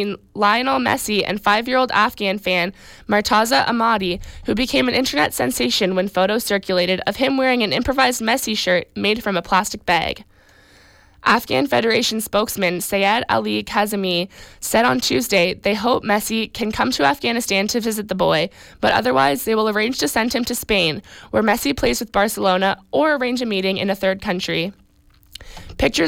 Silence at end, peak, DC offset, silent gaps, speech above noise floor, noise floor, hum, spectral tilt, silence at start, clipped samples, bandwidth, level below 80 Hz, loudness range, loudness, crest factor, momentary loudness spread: 0 s; -4 dBFS; under 0.1%; none; 34 dB; -53 dBFS; none; -3.5 dB/octave; 0 s; under 0.1%; 17 kHz; -44 dBFS; 2 LU; -19 LUFS; 14 dB; 6 LU